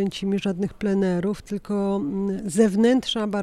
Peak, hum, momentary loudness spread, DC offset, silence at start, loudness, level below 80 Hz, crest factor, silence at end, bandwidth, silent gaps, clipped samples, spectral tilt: -6 dBFS; none; 8 LU; under 0.1%; 0 s; -23 LUFS; -52 dBFS; 16 dB; 0 s; 13 kHz; none; under 0.1%; -6 dB/octave